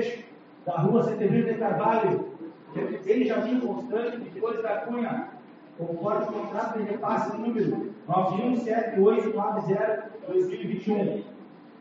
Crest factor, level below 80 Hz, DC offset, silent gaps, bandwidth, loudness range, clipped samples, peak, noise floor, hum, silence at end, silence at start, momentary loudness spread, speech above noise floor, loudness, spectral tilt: 16 dB; -76 dBFS; under 0.1%; none; 7.4 kHz; 4 LU; under 0.1%; -10 dBFS; -47 dBFS; none; 0 s; 0 s; 11 LU; 21 dB; -27 LUFS; -7 dB/octave